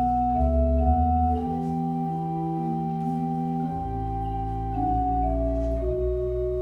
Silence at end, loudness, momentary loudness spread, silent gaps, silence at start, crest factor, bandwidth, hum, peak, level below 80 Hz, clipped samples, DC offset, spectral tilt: 0 s; -26 LUFS; 7 LU; none; 0 s; 14 dB; 4.1 kHz; none; -10 dBFS; -30 dBFS; under 0.1%; under 0.1%; -11 dB/octave